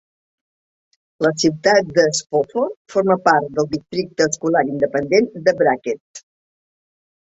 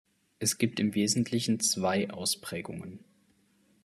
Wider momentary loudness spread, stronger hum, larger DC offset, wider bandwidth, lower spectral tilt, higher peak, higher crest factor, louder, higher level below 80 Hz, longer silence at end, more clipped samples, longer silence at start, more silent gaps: second, 8 LU vs 12 LU; neither; neither; second, 8.2 kHz vs 13.5 kHz; about the same, -4 dB/octave vs -3.5 dB/octave; first, -2 dBFS vs -12 dBFS; about the same, 18 dB vs 18 dB; first, -18 LUFS vs -29 LUFS; first, -58 dBFS vs -72 dBFS; first, 1.1 s vs 0.85 s; neither; first, 1.2 s vs 0.4 s; first, 2.77-2.85 s, 6.00-6.14 s vs none